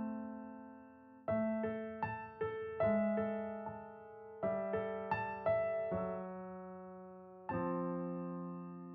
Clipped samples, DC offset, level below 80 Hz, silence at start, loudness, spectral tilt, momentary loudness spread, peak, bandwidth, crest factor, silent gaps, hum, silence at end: under 0.1%; under 0.1%; -70 dBFS; 0 s; -40 LUFS; -7.5 dB/octave; 17 LU; -24 dBFS; 4.8 kHz; 16 dB; none; none; 0 s